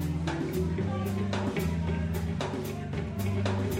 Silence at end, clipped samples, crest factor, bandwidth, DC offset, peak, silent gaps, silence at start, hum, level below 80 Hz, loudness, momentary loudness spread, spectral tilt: 0 s; under 0.1%; 14 dB; 16 kHz; under 0.1%; -16 dBFS; none; 0 s; none; -42 dBFS; -31 LUFS; 4 LU; -7 dB/octave